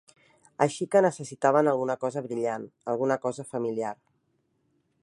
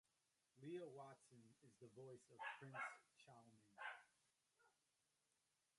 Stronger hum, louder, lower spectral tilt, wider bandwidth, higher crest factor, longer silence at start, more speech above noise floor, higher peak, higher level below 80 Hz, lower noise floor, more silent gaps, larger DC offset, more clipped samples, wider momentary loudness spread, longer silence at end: neither; first, -27 LUFS vs -57 LUFS; about the same, -6 dB/octave vs -5 dB/octave; about the same, 11.5 kHz vs 11 kHz; about the same, 22 dB vs 22 dB; about the same, 0.6 s vs 0.55 s; first, 46 dB vs 31 dB; first, -6 dBFS vs -40 dBFS; first, -78 dBFS vs under -90 dBFS; second, -73 dBFS vs -89 dBFS; neither; neither; neither; second, 11 LU vs 15 LU; about the same, 1.1 s vs 1.1 s